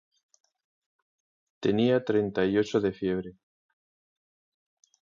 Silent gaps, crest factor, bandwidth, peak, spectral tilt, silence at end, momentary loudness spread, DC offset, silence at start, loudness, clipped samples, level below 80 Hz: none; 18 dB; 7.4 kHz; -12 dBFS; -7 dB/octave; 1.7 s; 8 LU; under 0.1%; 1.6 s; -27 LUFS; under 0.1%; -62 dBFS